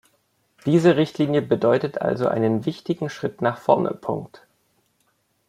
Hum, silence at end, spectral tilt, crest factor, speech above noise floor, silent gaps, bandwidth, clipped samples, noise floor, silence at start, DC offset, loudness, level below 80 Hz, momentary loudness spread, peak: none; 1.2 s; -7.5 dB/octave; 20 dB; 47 dB; none; 12 kHz; under 0.1%; -68 dBFS; 0.65 s; under 0.1%; -22 LUFS; -64 dBFS; 11 LU; -2 dBFS